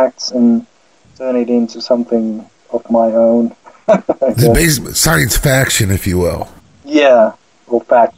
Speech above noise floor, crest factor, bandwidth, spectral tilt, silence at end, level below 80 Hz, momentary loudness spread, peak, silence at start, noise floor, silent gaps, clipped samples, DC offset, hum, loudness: 31 dB; 12 dB; 16.5 kHz; -4.5 dB/octave; 0.05 s; -30 dBFS; 12 LU; 0 dBFS; 0 s; -43 dBFS; none; under 0.1%; 0.2%; none; -13 LUFS